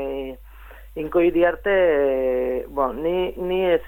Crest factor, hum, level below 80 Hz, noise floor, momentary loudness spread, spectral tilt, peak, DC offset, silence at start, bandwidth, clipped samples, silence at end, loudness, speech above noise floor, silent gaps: 14 dB; none; -42 dBFS; -42 dBFS; 14 LU; -7.5 dB/octave; -8 dBFS; under 0.1%; 0 s; 17 kHz; under 0.1%; 0 s; -21 LUFS; 22 dB; none